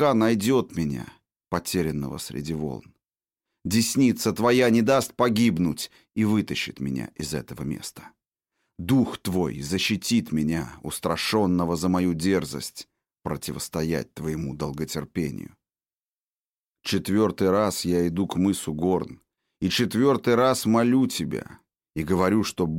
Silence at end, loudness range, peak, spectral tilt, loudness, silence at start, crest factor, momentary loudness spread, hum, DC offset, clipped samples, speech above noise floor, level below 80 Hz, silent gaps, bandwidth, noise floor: 0 s; 8 LU; -8 dBFS; -5 dB/octave; -25 LUFS; 0 s; 16 dB; 13 LU; none; under 0.1%; under 0.1%; over 66 dB; -52 dBFS; 15.93-16.74 s; 17 kHz; under -90 dBFS